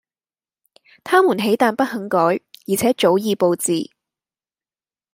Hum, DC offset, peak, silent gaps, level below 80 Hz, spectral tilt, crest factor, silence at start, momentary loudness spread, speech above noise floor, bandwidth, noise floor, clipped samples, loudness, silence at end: none; under 0.1%; -2 dBFS; none; -64 dBFS; -4.5 dB/octave; 18 dB; 1.05 s; 8 LU; over 73 dB; 16 kHz; under -90 dBFS; under 0.1%; -18 LUFS; 1.3 s